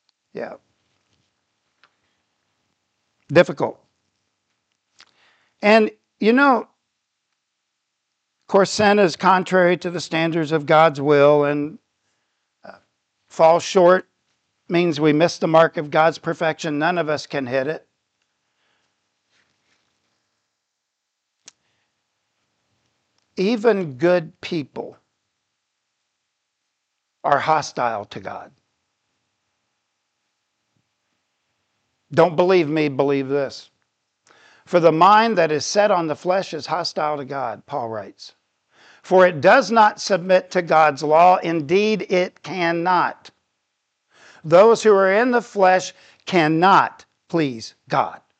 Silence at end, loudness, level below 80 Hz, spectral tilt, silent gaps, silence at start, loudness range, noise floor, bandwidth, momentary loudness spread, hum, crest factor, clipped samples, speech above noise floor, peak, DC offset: 0.25 s; -18 LUFS; -72 dBFS; -5.5 dB/octave; none; 0.35 s; 9 LU; -78 dBFS; 8.8 kHz; 14 LU; none; 20 dB; under 0.1%; 61 dB; -2 dBFS; under 0.1%